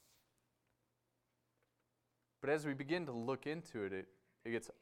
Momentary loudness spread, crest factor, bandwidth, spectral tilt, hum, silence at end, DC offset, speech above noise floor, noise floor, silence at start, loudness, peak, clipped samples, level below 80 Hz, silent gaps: 9 LU; 22 dB; 16 kHz; -6 dB/octave; none; 0.1 s; under 0.1%; 43 dB; -85 dBFS; 2.4 s; -42 LUFS; -24 dBFS; under 0.1%; -82 dBFS; none